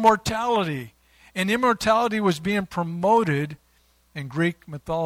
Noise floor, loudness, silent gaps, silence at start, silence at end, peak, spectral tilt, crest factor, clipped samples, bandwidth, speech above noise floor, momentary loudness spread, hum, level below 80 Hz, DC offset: -62 dBFS; -23 LUFS; none; 0 s; 0 s; -4 dBFS; -5.5 dB/octave; 20 dB; under 0.1%; 16.5 kHz; 39 dB; 14 LU; none; -52 dBFS; under 0.1%